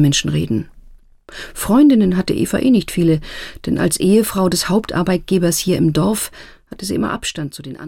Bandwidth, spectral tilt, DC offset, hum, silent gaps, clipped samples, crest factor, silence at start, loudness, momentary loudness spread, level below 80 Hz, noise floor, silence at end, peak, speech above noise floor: 17.5 kHz; -5 dB/octave; 0.3%; none; none; under 0.1%; 14 dB; 0 s; -16 LUFS; 15 LU; -40 dBFS; -43 dBFS; 0 s; -4 dBFS; 27 dB